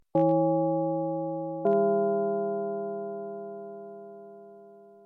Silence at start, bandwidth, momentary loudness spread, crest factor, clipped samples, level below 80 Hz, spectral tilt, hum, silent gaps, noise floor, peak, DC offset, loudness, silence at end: 0.15 s; 3.4 kHz; 21 LU; 14 dB; under 0.1%; -80 dBFS; -12 dB/octave; none; none; -51 dBFS; -14 dBFS; under 0.1%; -28 LUFS; 0.15 s